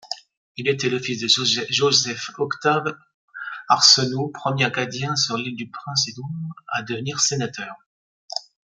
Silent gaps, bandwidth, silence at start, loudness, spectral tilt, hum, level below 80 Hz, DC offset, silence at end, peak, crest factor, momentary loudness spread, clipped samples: 0.37-0.55 s, 3.14-3.28 s, 7.86-8.28 s; 12 kHz; 0.05 s; -20 LUFS; -2.5 dB/octave; none; -66 dBFS; under 0.1%; 0.4 s; 0 dBFS; 22 dB; 17 LU; under 0.1%